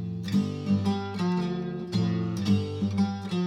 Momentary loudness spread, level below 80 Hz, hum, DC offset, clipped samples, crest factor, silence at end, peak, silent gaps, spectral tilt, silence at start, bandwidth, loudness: 3 LU; -60 dBFS; none; under 0.1%; under 0.1%; 16 dB; 0 s; -12 dBFS; none; -7.5 dB/octave; 0 s; 11 kHz; -28 LUFS